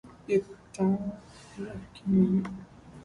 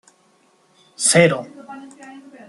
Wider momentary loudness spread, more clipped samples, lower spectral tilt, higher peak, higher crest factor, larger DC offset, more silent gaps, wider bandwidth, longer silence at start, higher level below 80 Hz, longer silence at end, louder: second, 21 LU vs 25 LU; neither; first, -8.5 dB/octave vs -3.5 dB/octave; second, -12 dBFS vs 0 dBFS; about the same, 18 dB vs 22 dB; neither; neither; second, 10.5 kHz vs 12.5 kHz; second, 0.05 s vs 1 s; about the same, -58 dBFS vs -62 dBFS; second, 0 s vs 0.3 s; second, -29 LUFS vs -16 LUFS